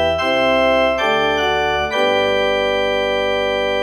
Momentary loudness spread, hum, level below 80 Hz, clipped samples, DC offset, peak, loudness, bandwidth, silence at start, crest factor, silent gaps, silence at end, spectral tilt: 3 LU; none; -40 dBFS; under 0.1%; under 0.1%; -4 dBFS; -16 LUFS; 13.5 kHz; 0 s; 12 dB; none; 0 s; -4 dB/octave